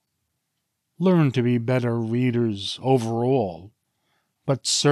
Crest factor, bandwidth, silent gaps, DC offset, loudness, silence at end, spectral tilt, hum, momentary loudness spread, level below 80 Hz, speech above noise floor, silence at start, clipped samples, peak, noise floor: 16 dB; 13 kHz; none; under 0.1%; -23 LUFS; 0 s; -5.5 dB/octave; none; 8 LU; -68 dBFS; 56 dB; 1 s; under 0.1%; -8 dBFS; -78 dBFS